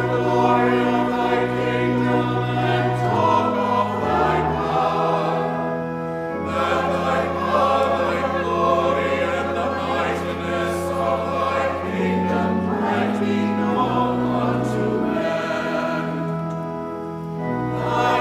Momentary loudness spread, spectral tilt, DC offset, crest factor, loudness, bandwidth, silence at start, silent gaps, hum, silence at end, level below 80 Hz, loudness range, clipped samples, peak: 7 LU; -7 dB/octave; under 0.1%; 16 dB; -21 LUFS; 15 kHz; 0 s; none; none; 0 s; -46 dBFS; 2 LU; under 0.1%; -4 dBFS